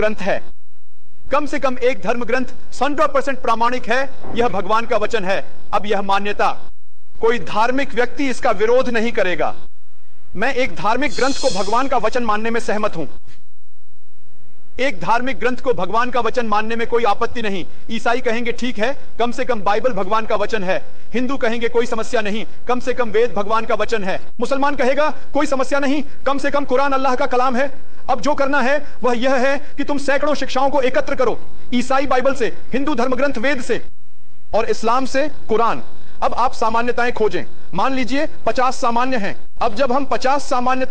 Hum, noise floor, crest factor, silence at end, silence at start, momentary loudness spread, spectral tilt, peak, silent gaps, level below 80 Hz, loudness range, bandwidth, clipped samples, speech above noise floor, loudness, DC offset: none; -60 dBFS; 14 dB; 0 s; 0 s; 6 LU; -4.5 dB/octave; -4 dBFS; none; -42 dBFS; 2 LU; 9.8 kHz; under 0.1%; 41 dB; -19 LUFS; 20%